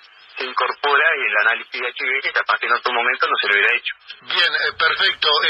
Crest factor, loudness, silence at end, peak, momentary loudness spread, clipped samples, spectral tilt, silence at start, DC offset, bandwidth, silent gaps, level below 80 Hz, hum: 16 dB; -17 LUFS; 0 s; -4 dBFS; 10 LU; under 0.1%; -1.5 dB/octave; 0.35 s; under 0.1%; 9.4 kHz; none; -66 dBFS; none